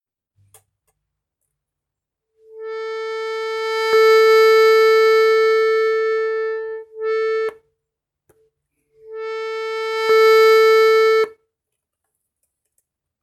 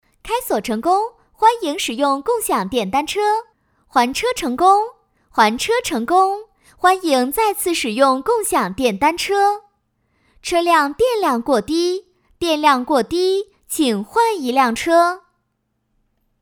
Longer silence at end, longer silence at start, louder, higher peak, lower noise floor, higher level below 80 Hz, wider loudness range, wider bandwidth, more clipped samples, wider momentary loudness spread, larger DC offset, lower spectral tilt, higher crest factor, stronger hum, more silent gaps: first, 1.95 s vs 1.25 s; first, 2.55 s vs 0.25 s; first, -15 LUFS vs -18 LUFS; second, -4 dBFS vs 0 dBFS; first, -83 dBFS vs -71 dBFS; second, -76 dBFS vs -50 dBFS; first, 13 LU vs 2 LU; second, 14 kHz vs over 20 kHz; neither; first, 16 LU vs 7 LU; neither; second, 0 dB/octave vs -3 dB/octave; about the same, 14 dB vs 18 dB; neither; neither